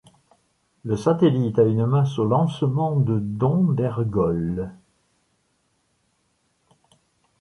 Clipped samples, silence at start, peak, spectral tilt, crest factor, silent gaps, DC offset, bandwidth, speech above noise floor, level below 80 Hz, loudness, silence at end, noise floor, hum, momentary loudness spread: under 0.1%; 0.85 s; -6 dBFS; -9 dB/octave; 16 dB; none; under 0.1%; 11 kHz; 48 dB; -50 dBFS; -21 LUFS; 2.65 s; -69 dBFS; none; 9 LU